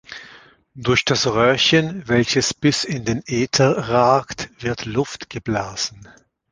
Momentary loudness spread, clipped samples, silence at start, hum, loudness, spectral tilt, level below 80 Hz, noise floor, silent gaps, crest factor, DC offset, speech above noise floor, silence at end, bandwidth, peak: 11 LU; under 0.1%; 0.1 s; none; -19 LUFS; -4 dB/octave; -48 dBFS; -47 dBFS; none; 18 dB; under 0.1%; 28 dB; 0.45 s; 10 kHz; -2 dBFS